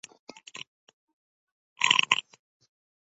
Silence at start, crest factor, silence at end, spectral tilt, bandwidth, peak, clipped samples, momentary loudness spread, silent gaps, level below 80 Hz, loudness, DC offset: 1.8 s; 32 dB; 0.85 s; 1 dB/octave; 11 kHz; -2 dBFS; under 0.1%; 25 LU; none; -76 dBFS; -23 LUFS; under 0.1%